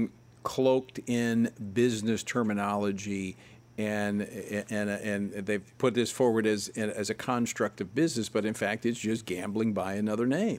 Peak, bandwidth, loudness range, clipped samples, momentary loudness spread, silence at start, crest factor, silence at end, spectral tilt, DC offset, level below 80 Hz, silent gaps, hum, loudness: -12 dBFS; 16 kHz; 3 LU; under 0.1%; 7 LU; 0 s; 18 dB; 0 s; -5 dB/octave; under 0.1%; -68 dBFS; none; none; -30 LUFS